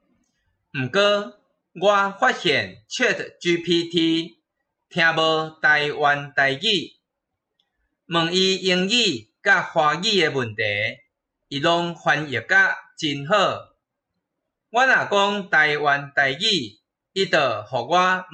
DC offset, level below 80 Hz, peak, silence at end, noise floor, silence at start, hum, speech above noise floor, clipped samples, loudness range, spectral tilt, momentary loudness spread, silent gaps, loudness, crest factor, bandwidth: under 0.1%; -66 dBFS; -6 dBFS; 0.1 s; -81 dBFS; 0.75 s; none; 60 dB; under 0.1%; 2 LU; -3.5 dB/octave; 9 LU; none; -20 LUFS; 16 dB; 8.8 kHz